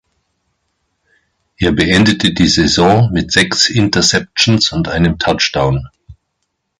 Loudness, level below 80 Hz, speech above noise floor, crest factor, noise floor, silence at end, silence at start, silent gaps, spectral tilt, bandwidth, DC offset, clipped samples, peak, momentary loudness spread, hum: -12 LUFS; -34 dBFS; 58 dB; 14 dB; -70 dBFS; 0.65 s; 1.6 s; none; -4 dB/octave; 11.5 kHz; under 0.1%; under 0.1%; 0 dBFS; 5 LU; none